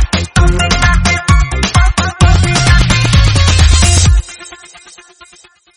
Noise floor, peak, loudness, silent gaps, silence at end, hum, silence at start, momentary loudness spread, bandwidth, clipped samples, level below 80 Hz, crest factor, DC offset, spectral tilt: -44 dBFS; 0 dBFS; -10 LUFS; none; 1.2 s; none; 0 s; 5 LU; 11 kHz; 0.4%; -14 dBFS; 10 dB; under 0.1%; -4 dB/octave